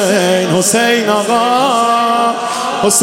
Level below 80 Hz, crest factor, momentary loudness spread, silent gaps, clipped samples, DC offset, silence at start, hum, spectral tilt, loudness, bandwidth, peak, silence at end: -60 dBFS; 12 dB; 4 LU; none; under 0.1%; 0.1%; 0 s; none; -3 dB/octave; -12 LUFS; 17 kHz; 0 dBFS; 0 s